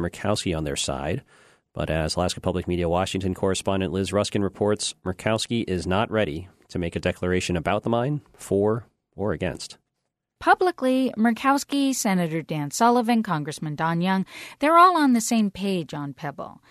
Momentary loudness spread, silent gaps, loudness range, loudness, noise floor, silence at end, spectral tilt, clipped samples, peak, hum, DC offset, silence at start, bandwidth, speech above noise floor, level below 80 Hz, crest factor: 11 LU; none; 5 LU; -24 LUFS; -80 dBFS; 0.2 s; -5 dB/octave; under 0.1%; -4 dBFS; none; under 0.1%; 0 s; 13.5 kHz; 56 dB; -48 dBFS; 20 dB